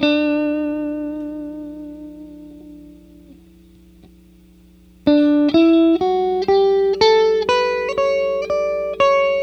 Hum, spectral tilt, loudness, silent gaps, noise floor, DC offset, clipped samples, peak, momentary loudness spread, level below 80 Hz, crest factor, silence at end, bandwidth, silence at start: none; -5 dB/octave; -17 LUFS; none; -48 dBFS; under 0.1%; under 0.1%; -2 dBFS; 19 LU; -50 dBFS; 16 dB; 0 s; 8.2 kHz; 0 s